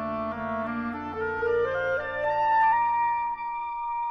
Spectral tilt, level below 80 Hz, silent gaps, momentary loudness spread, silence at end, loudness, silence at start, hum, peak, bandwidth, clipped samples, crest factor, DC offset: -7 dB/octave; -58 dBFS; none; 10 LU; 0 s; -27 LUFS; 0 s; none; -14 dBFS; 6 kHz; under 0.1%; 12 dB; under 0.1%